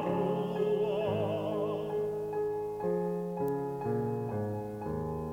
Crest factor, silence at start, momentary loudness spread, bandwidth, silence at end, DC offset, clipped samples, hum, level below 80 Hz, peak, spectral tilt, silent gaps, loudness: 12 dB; 0 s; 5 LU; 17 kHz; 0 s; under 0.1%; under 0.1%; none; -58 dBFS; -20 dBFS; -8.5 dB/octave; none; -33 LUFS